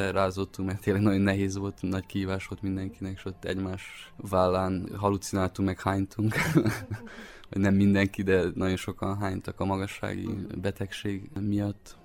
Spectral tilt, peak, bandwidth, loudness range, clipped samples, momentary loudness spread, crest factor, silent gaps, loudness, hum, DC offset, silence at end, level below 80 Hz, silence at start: -6.5 dB/octave; -10 dBFS; 16.5 kHz; 5 LU; under 0.1%; 12 LU; 18 dB; none; -29 LUFS; none; under 0.1%; 0.1 s; -52 dBFS; 0 s